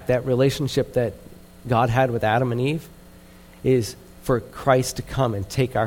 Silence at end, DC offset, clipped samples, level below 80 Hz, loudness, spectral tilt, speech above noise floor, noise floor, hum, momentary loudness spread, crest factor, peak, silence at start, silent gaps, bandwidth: 0 s; under 0.1%; under 0.1%; -44 dBFS; -23 LUFS; -6 dB/octave; 25 dB; -46 dBFS; none; 8 LU; 18 dB; -4 dBFS; 0 s; none; 17 kHz